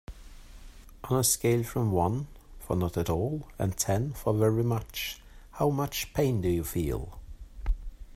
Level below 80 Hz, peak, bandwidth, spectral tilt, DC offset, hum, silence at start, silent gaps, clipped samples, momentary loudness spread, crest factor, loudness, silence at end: -42 dBFS; -12 dBFS; 16 kHz; -5 dB/octave; under 0.1%; none; 0.1 s; none; under 0.1%; 19 LU; 18 dB; -29 LUFS; 0 s